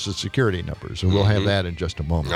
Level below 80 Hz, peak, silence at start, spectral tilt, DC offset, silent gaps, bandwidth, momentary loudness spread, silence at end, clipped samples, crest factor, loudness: -40 dBFS; -6 dBFS; 0 s; -6 dB/octave; under 0.1%; none; 10.5 kHz; 9 LU; 0 s; under 0.1%; 16 dB; -22 LUFS